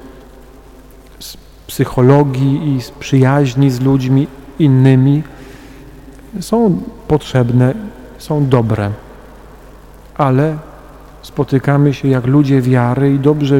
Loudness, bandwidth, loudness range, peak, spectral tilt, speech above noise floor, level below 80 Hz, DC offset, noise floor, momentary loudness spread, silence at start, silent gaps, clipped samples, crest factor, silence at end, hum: -13 LUFS; 15.5 kHz; 5 LU; 0 dBFS; -8 dB/octave; 26 dB; -38 dBFS; under 0.1%; -38 dBFS; 19 LU; 0.05 s; none; under 0.1%; 14 dB; 0 s; none